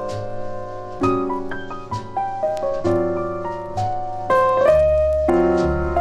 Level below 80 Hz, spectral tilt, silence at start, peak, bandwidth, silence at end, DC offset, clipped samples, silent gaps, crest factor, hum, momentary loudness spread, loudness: -34 dBFS; -7.5 dB/octave; 0 s; -4 dBFS; 11 kHz; 0 s; under 0.1%; under 0.1%; none; 16 dB; none; 15 LU; -20 LUFS